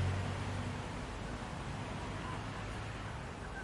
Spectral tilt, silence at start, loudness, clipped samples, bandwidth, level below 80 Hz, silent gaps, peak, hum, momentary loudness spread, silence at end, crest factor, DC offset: -5.5 dB/octave; 0 s; -42 LUFS; under 0.1%; 11.5 kHz; -50 dBFS; none; -26 dBFS; none; 5 LU; 0 s; 14 dB; under 0.1%